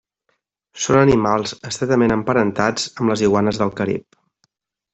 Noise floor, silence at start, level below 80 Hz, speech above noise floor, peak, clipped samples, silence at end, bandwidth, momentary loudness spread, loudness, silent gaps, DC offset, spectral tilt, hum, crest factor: -70 dBFS; 0.75 s; -48 dBFS; 53 dB; -2 dBFS; under 0.1%; 0.95 s; 8.4 kHz; 10 LU; -18 LUFS; none; under 0.1%; -5.5 dB/octave; none; 16 dB